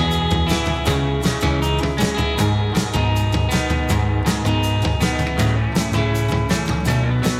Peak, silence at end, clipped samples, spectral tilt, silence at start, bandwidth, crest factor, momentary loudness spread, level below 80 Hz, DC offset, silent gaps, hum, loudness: -6 dBFS; 0 s; under 0.1%; -5.5 dB/octave; 0 s; 16 kHz; 12 dB; 1 LU; -26 dBFS; under 0.1%; none; none; -19 LUFS